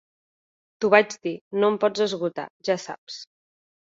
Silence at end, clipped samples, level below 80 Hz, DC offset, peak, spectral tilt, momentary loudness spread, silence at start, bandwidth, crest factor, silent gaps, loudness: 0.7 s; under 0.1%; -72 dBFS; under 0.1%; -2 dBFS; -4.5 dB/octave; 17 LU; 0.8 s; 7.8 kHz; 24 dB; 1.41-1.51 s, 2.50-2.60 s, 2.98-3.07 s; -23 LUFS